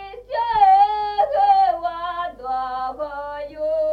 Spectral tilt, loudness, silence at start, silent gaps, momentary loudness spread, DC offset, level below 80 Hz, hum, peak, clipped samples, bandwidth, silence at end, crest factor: -4.5 dB/octave; -20 LUFS; 0 s; none; 14 LU; under 0.1%; -50 dBFS; none; -4 dBFS; under 0.1%; 5.2 kHz; 0 s; 14 dB